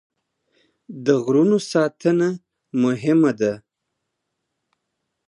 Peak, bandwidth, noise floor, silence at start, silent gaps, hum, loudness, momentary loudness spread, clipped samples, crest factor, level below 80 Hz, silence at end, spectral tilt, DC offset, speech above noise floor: -4 dBFS; 10.5 kHz; -79 dBFS; 0.9 s; none; none; -20 LUFS; 12 LU; under 0.1%; 18 dB; -70 dBFS; 1.7 s; -6.5 dB/octave; under 0.1%; 60 dB